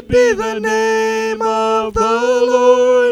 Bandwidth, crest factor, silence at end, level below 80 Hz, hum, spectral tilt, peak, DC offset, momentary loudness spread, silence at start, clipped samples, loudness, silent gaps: 13 kHz; 12 dB; 0 s; -40 dBFS; none; -4 dB/octave; -2 dBFS; under 0.1%; 6 LU; 0.1 s; under 0.1%; -14 LUFS; none